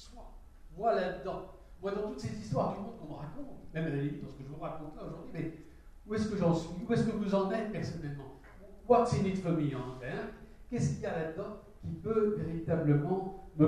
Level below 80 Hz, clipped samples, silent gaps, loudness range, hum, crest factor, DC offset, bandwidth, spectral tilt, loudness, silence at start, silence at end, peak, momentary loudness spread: -54 dBFS; under 0.1%; none; 6 LU; none; 22 dB; under 0.1%; 11 kHz; -7.5 dB/octave; -34 LUFS; 0 s; 0 s; -12 dBFS; 16 LU